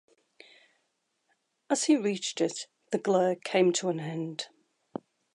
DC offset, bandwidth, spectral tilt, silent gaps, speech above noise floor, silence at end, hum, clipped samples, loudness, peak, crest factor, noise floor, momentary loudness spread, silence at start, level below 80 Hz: under 0.1%; 11.5 kHz; -4 dB/octave; none; 50 dB; 0.9 s; none; under 0.1%; -29 LUFS; -12 dBFS; 20 dB; -78 dBFS; 19 LU; 1.7 s; -84 dBFS